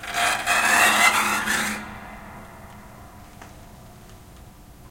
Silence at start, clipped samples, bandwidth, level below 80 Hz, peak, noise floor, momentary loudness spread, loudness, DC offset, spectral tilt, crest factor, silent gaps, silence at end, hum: 0 s; under 0.1%; 17 kHz; -50 dBFS; -4 dBFS; -45 dBFS; 25 LU; -19 LUFS; under 0.1%; -1 dB/octave; 22 dB; none; 0.05 s; none